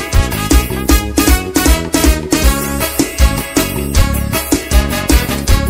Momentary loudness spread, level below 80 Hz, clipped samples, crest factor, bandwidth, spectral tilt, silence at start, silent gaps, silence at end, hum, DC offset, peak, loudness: 3 LU; -16 dBFS; 0.2%; 12 dB; 16.5 kHz; -4.5 dB/octave; 0 s; none; 0 s; none; under 0.1%; 0 dBFS; -13 LUFS